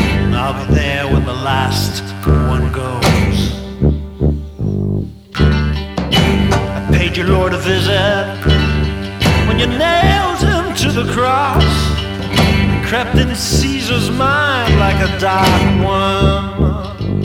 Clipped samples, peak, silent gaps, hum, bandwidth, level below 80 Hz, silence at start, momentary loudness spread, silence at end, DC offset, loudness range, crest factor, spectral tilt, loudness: under 0.1%; 0 dBFS; none; none; 16.5 kHz; -22 dBFS; 0 s; 6 LU; 0 s; under 0.1%; 3 LU; 14 dB; -5.5 dB/octave; -14 LUFS